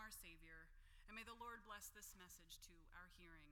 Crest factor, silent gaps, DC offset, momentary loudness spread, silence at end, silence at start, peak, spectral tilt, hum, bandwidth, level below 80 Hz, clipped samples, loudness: 18 dB; none; under 0.1%; 8 LU; 0 s; 0 s; -44 dBFS; -2 dB/octave; none; 19 kHz; -68 dBFS; under 0.1%; -60 LUFS